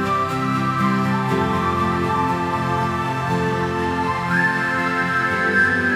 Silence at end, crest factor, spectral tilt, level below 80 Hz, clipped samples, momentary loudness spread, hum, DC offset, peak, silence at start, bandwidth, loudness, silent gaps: 0 s; 14 dB; -6 dB/octave; -50 dBFS; under 0.1%; 4 LU; none; under 0.1%; -6 dBFS; 0 s; 15.5 kHz; -20 LUFS; none